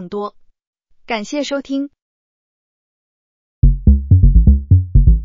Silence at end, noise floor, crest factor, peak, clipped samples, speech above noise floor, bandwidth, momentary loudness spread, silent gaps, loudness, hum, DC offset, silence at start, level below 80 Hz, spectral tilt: 0 s; under -90 dBFS; 14 dB; 0 dBFS; under 0.1%; over 68 dB; 7.6 kHz; 14 LU; 0.67-0.73 s, 2.02-3.62 s; -15 LUFS; none; under 0.1%; 0 s; -16 dBFS; -8 dB/octave